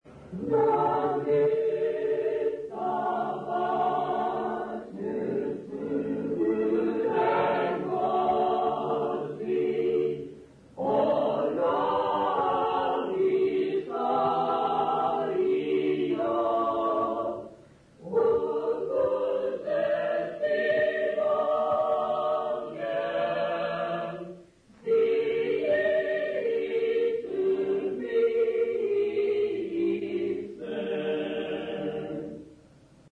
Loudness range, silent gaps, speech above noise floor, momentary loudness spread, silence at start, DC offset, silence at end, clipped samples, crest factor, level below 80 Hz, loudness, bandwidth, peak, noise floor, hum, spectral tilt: 3 LU; none; 31 dB; 8 LU; 0.05 s; under 0.1%; 0.55 s; under 0.1%; 14 dB; -64 dBFS; -28 LUFS; 4.9 kHz; -14 dBFS; -56 dBFS; none; -7.5 dB/octave